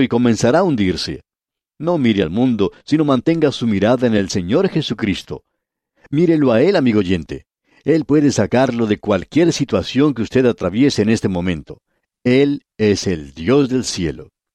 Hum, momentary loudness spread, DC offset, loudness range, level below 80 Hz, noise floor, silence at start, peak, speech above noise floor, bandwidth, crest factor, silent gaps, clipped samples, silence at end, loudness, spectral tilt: none; 9 LU; under 0.1%; 2 LU; -46 dBFS; -87 dBFS; 0 s; -2 dBFS; 71 dB; 11.5 kHz; 14 dB; none; under 0.1%; 0.3 s; -17 LUFS; -6 dB/octave